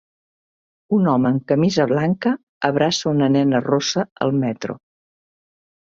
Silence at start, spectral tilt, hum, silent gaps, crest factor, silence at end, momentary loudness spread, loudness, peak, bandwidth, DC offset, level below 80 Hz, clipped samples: 0.9 s; -6 dB/octave; none; 2.43-2.61 s, 4.11-4.16 s; 18 dB; 1.2 s; 6 LU; -19 LUFS; -2 dBFS; 7.8 kHz; under 0.1%; -60 dBFS; under 0.1%